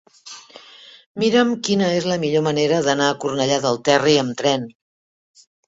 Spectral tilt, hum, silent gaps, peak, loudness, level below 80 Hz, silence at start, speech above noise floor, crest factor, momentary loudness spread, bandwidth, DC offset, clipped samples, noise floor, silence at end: -4.5 dB/octave; none; 1.06-1.15 s; -2 dBFS; -19 LUFS; -62 dBFS; 0.25 s; over 71 dB; 18 dB; 19 LU; 8 kHz; under 0.1%; under 0.1%; under -90 dBFS; 1 s